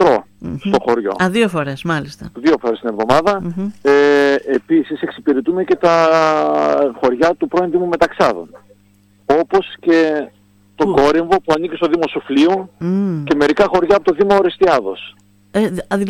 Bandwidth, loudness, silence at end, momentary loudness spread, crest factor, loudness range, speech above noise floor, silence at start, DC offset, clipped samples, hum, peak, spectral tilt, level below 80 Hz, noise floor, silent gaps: 13 kHz; -15 LUFS; 0 s; 8 LU; 16 dB; 3 LU; 37 dB; 0 s; under 0.1%; under 0.1%; none; 0 dBFS; -6 dB/octave; -46 dBFS; -52 dBFS; none